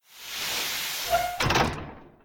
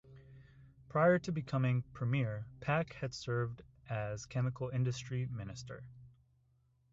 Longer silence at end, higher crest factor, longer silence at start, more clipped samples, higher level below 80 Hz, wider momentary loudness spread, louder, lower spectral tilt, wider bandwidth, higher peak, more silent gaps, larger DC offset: second, 0.15 s vs 0.85 s; about the same, 18 dB vs 20 dB; about the same, 0.1 s vs 0.1 s; neither; first, -44 dBFS vs -64 dBFS; about the same, 13 LU vs 15 LU; first, -26 LUFS vs -36 LUFS; second, -3 dB/octave vs -6.5 dB/octave; first, 19.5 kHz vs 7.8 kHz; first, -12 dBFS vs -18 dBFS; neither; neither